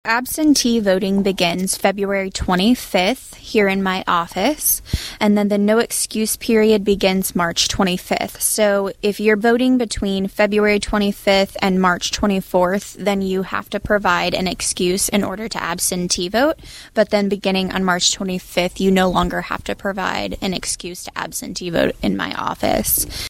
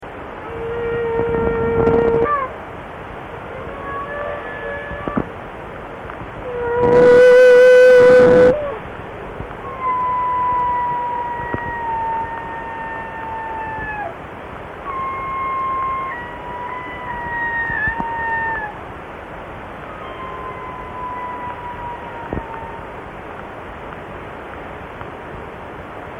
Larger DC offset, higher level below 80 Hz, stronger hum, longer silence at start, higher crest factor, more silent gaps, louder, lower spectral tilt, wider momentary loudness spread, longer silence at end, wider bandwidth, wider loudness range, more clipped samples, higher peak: neither; about the same, -38 dBFS vs -40 dBFS; neither; about the same, 0.05 s vs 0 s; first, 18 dB vs 12 dB; neither; about the same, -18 LUFS vs -17 LUFS; second, -4 dB/octave vs -6.5 dB/octave; second, 7 LU vs 22 LU; about the same, 0 s vs 0 s; first, 16.5 kHz vs 9.6 kHz; second, 4 LU vs 18 LU; neither; first, 0 dBFS vs -6 dBFS